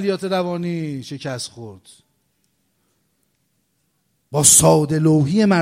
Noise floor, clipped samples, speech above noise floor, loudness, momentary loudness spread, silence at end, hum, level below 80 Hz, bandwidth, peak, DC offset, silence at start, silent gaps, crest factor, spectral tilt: -68 dBFS; under 0.1%; 51 dB; -16 LUFS; 19 LU; 0 s; none; -52 dBFS; 16 kHz; 0 dBFS; under 0.1%; 0 s; none; 20 dB; -4 dB/octave